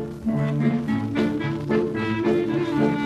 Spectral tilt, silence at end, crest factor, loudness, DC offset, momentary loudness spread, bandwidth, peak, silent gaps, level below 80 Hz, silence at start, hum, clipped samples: -8 dB/octave; 0 s; 14 dB; -23 LUFS; under 0.1%; 3 LU; 10.5 kHz; -8 dBFS; none; -50 dBFS; 0 s; none; under 0.1%